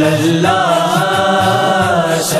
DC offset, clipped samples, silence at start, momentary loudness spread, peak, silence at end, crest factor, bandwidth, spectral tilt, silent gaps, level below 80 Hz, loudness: under 0.1%; under 0.1%; 0 s; 1 LU; 0 dBFS; 0 s; 12 dB; 14 kHz; -4.5 dB/octave; none; -48 dBFS; -12 LUFS